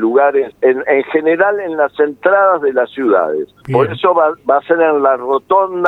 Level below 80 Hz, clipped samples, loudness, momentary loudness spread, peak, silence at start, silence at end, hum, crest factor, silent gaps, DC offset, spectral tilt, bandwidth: -58 dBFS; under 0.1%; -13 LUFS; 5 LU; 0 dBFS; 0 s; 0 s; none; 12 dB; none; under 0.1%; -8.5 dB/octave; 4.1 kHz